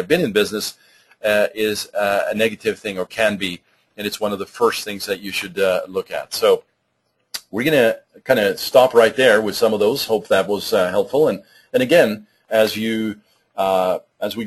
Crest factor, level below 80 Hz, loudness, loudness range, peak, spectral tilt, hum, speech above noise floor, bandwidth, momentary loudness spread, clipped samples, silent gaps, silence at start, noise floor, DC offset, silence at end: 18 dB; -58 dBFS; -19 LUFS; 6 LU; 0 dBFS; -4 dB/octave; none; 51 dB; 13 kHz; 12 LU; under 0.1%; none; 0 s; -69 dBFS; under 0.1%; 0 s